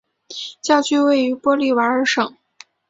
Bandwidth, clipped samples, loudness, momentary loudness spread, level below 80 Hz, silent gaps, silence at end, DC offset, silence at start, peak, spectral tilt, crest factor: 8 kHz; under 0.1%; -18 LUFS; 14 LU; -66 dBFS; none; 0.6 s; under 0.1%; 0.3 s; -2 dBFS; -2.5 dB/octave; 18 dB